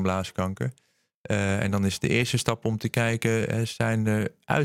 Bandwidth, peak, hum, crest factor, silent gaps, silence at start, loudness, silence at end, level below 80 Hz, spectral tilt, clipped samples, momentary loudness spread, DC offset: 16 kHz; -4 dBFS; none; 22 dB; 1.14-1.24 s; 0 s; -26 LUFS; 0 s; -56 dBFS; -5.5 dB/octave; under 0.1%; 6 LU; under 0.1%